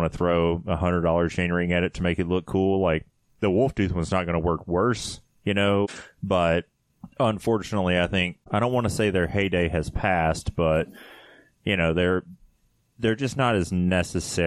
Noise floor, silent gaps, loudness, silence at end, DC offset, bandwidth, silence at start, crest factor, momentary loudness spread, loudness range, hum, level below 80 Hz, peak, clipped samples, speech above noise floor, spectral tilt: -65 dBFS; none; -24 LUFS; 0 s; under 0.1%; 13 kHz; 0 s; 16 dB; 5 LU; 2 LU; none; -42 dBFS; -8 dBFS; under 0.1%; 41 dB; -6 dB/octave